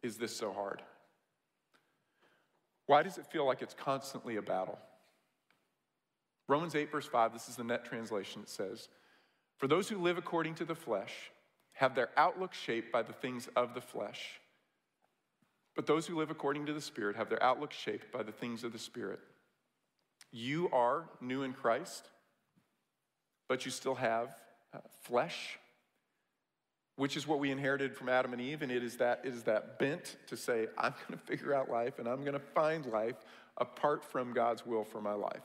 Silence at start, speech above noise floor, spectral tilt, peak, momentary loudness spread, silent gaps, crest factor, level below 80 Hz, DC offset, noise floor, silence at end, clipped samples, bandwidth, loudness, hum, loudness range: 0.05 s; 52 dB; -4.5 dB/octave; -16 dBFS; 13 LU; none; 22 dB; -88 dBFS; under 0.1%; -88 dBFS; 0 s; under 0.1%; 16 kHz; -36 LUFS; none; 4 LU